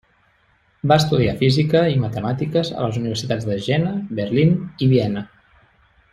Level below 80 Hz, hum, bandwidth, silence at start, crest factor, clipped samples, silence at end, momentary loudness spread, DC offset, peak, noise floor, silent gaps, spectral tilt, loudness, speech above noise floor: -48 dBFS; none; 14.5 kHz; 0.85 s; 18 dB; under 0.1%; 0.85 s; 8 LU; under 0.1%; -2 dBFS; -60 dBFS; none; -7 dB/octave; -19 LUFS; 41 dB